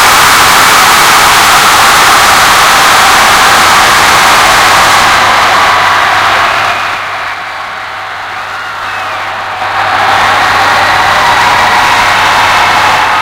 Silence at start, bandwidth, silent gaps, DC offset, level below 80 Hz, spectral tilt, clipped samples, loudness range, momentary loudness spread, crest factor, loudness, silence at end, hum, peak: 0 s; over 20 kHz; none; under 0.1%; -34 dBFS; -1 dB/octave; 8%; 9 LU; 13 LU; 6 dB; -4 LUFS; 0 s; none; 0 dBFS